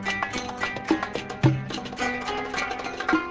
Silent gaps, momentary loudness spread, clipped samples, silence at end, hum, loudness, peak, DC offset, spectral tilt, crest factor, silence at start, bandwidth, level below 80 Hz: none; 6 LU; under 0.1%; 0 s; none; -27 LUFS; -6 dBFS; under 0.1%; -5.5 dB/octave; 22 dB; 0 s; 8 kHz; -50 dBFS